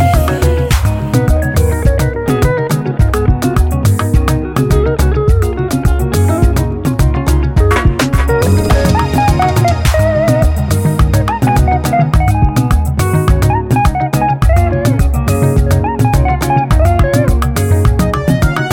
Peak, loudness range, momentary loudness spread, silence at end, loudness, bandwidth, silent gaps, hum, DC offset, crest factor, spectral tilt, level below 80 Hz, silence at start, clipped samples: 0 dBFS; 1 LU; 2 LU; 0 s; -12 LUFS; 17 kHz; none; none; 0.3%; 10 dB; -6.5 dB/octave; -16 dBFS; 0 s; under 0.1%